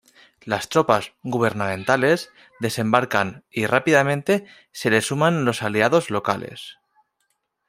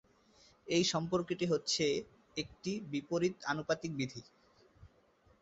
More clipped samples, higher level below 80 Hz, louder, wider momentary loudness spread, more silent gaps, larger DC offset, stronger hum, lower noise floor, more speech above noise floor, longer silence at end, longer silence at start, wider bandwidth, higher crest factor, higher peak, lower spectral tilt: neither; first, -62 dBFS vs -68 dBFS; first, -21 LUFS vs -36 LUFS; about the same, 10 LU vs 11 LU; neither; neither; neither; first, -73 dBFS vs -68 dBFS; first, 51 dB vs 33 dB; first, 0.95 s vs 0.55 s; second, 0.45 s vs 0.65 s; first, 16 kHz vs 8 kHz; about the same, 20 dB vs 18 dB; first, -2 dBFS vs -20 dBFS; about the same, -5 dB/octave vs -4 dB/octave